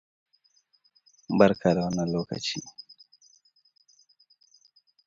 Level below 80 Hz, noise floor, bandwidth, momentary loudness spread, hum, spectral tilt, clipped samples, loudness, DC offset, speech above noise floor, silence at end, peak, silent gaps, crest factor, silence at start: -60 dBFS; -68 dBFS; 7.8 kHz; 24 LU; none; -6 dB/octave; under 0.1%; -26 LUFS; under 0.1%; 43 dB; 2.25 s; -4 dBFS; none; 26 dB; 1.3 s